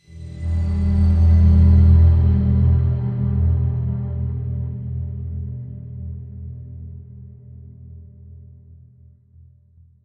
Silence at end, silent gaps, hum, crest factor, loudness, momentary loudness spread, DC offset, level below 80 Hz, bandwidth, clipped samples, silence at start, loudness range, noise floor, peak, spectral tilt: 1.65 s; none; none; 14 dB; -18 LUFS; 22 LU; under 0.1%; -28 dBFS; 2.1 kHz; under 0.1%; 0.15 s; 21 LU; -51 dBFS; -4 dBFS; -11 dB/octave